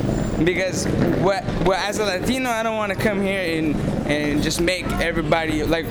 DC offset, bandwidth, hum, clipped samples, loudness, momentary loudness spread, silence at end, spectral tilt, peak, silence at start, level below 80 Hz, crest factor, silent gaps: under 0.1%; over 20 kHz; none; under 0.1%; -21 LUFS; 2 LU; 0 s; -5 dB/octave; -8 dBFS; 0 s; -34 dBFS; 14 dB; none